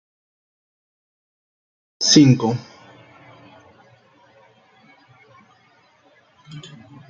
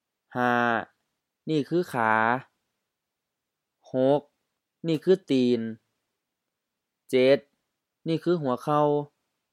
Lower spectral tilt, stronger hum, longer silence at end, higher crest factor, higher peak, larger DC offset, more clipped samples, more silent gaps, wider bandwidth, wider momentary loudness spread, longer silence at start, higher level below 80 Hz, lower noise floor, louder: second, -4.5 dB/octave vs -7 dB/octave; neither; about the same, 0.5 s vs 0.45 s; about the same, 24 dB vs 20 dB; first, 0 dBFS vs -6 dBFS; neither; neither; neither; second, 7.6 kHz vs 14 kHz; first, 29 LU vs 13 LU; first, 2 s vs 0.35 s; first, -64 dBFS vs -80 dBFS; second, -57 dBFS vs -85 dBFS; first, -15 LUFS vs -25 LUFS